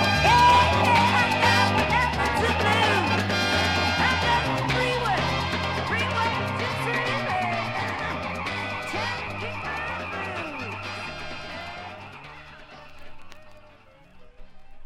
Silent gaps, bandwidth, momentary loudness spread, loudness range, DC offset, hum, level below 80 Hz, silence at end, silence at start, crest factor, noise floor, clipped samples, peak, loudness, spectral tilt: none; 16 kHz; 16 LU; 16 LU; under 0.1%; none; -42 dBFS; 0 s; 0 s; 18 dB; -52 dBFS; under 0.1%; -8 dBFS; -23 LUFS; -4.5 dB/octave